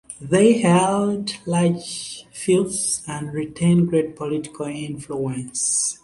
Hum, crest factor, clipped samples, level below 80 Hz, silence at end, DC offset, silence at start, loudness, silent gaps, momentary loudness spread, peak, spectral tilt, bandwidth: none; 18 dB; under 0.1%; -56 dBFS; 0.1 s; under 0.1%; 0.1 s; -21 LUFS; none; 13 LU; -2 dBFS; -5 dB/octave; 11.5 kHz